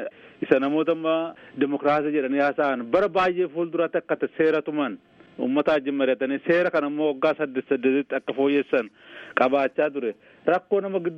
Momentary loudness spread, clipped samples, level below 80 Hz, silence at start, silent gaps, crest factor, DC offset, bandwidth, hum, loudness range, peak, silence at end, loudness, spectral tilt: 8 LU; under 0.1%; -66 dBFS; 0 s; none; 20 dB; under 0.1%; 7 kHz; none; 1 LU; -4 dBFS; 0 s; -24 LUFS; -7.5 dB/octave